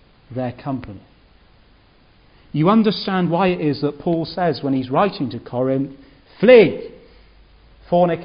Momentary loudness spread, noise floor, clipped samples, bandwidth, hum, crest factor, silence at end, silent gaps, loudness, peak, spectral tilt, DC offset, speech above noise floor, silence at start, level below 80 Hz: 17 LU; -52 dBFS; under 0.1%; 5.4 kHz; none; 20 dB; 0 s; none; -18 LUFS; 0 dBFS; -11.5 dB/octave; under 0.1%; 35 dB; 0.3 s; -52 dBFS